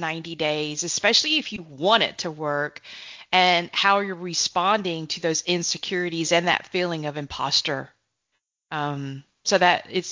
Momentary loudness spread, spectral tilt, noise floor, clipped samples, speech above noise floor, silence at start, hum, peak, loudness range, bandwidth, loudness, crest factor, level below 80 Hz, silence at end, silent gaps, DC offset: 12 LU; -2.5 dB/octave; -78 dBFS; under 0.1%; 54 dB; 0 s; none; -4 dBFS; 3 LU; 7.6 kHz; -23 LUFS; 20 dB; -62 dBFS; 0 s; none; under 0.1%